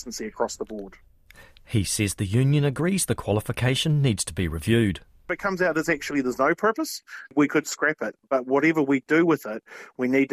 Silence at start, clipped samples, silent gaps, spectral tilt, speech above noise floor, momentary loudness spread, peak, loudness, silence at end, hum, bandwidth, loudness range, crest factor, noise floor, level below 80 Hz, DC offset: 0 s; under 0.1%; none; -5 dB/octave; 27 dB; 12 LU; -8 dBFS; -24 LUFS; 0 s; none; 15.5 kHz; 2 LU; 16 dB; -51 dBFS; -48 dBFS; under 0.1%